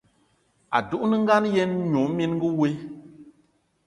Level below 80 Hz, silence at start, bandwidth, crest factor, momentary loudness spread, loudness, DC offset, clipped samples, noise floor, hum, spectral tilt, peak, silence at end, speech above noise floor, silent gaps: -62 dBFS; 0.7 s; 11 kHz; 18 dB; 11 LU; -23 LUFS; under 0.1%; under 0.1%; -65 dBFS; none; -7 dB/octave; -6 dBFS; 0.55 s; 43 dB; none